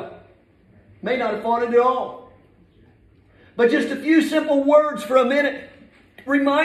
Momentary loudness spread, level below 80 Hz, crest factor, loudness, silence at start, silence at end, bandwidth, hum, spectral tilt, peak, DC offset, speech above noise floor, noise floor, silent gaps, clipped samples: 16 LU; -62 dBFS; 18 dB; -19 LUFS; 0 s; 0 s; 13.5 kHz; none; -5 dB/octave; -2 dBFS; under 0.1%; 36 dB; -54 dBFS; none; under 0.1%